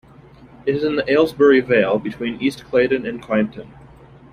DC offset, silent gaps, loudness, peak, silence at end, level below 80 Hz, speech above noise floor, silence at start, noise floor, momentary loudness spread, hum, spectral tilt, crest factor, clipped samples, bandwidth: under 0.1%; none; -18 LUFS; -2 dBFS; 0.65 s; -52 dBFS; 27 dB; 0.65 s; -45 dBFS; 11 LU; none; -6.5 dB/octave; 16 dB; under 0.1%; 14 kHz